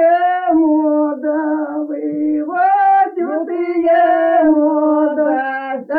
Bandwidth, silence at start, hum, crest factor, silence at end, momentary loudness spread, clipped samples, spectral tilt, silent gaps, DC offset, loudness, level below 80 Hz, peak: 4.3 kHz; 0 s; none; 12 dB; 0 s; 8 LU; under 0.1%; -8.5 dB/octave; none; under 0.1%; -15 LUFS; -60 dBFS; -2 dBFS